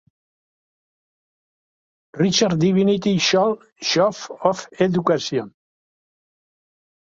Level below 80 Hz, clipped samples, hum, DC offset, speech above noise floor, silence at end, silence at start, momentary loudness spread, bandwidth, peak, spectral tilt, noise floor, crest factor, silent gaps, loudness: -60 dBFS; under 0.1%; none; under 0.1%; over 71 dB; 1.55 s; 2.15 s; 7 LU; 7.6 kHz; -2 dBFS; -5 dB/octave; under -90 dBFS; 20 dB; none; -19 LUFS